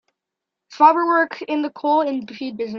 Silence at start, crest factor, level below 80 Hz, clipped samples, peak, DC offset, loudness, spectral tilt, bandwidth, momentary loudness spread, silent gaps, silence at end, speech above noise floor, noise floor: 0.7 s; 18 dB; -74 dBFS; under 0.1%; -2 dBFS; under 0.1%; -19 LUFS; -5.5 dB/octave; 6.8 kHz; 13 LU; none; 0 s; 65 dB; -84 dBFS